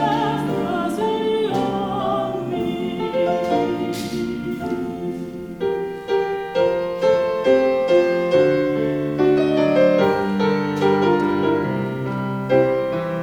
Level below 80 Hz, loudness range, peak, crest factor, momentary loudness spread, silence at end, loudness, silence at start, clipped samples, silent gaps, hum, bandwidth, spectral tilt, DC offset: -52 dBFS; 6 LU; -4 dBFS; 16 dB; 8 LU; 0 s; -20 LUFS; 0 s; under 0.1%; none; none; 19 kHz; -7 dB/octave; under 0.1%